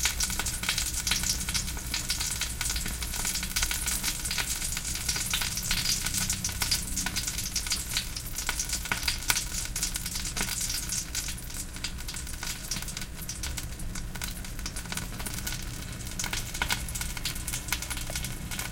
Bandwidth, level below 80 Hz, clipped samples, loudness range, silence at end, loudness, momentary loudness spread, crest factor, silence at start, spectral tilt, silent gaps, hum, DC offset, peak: 17 kHz; -38 dBFS; under 0.1%; 7 LU; 0 s; -30 LUFS; 9 LU; 28 dB; 0 s; -1 dB/octave; none; none; under 0.1%; -4 dBFS